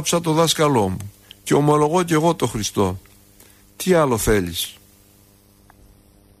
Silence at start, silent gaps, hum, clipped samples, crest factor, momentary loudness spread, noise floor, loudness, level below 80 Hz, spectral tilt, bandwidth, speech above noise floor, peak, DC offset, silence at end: 0 s; none; none; under 0.1%; 16 dB; 12 LU; -52 dBFS; -19 LUFS; -42 dBFS; -4.5 dB/octave; 15.5 kHz; 34 dB; -4 dBFS; under 0.1%; 1.7 s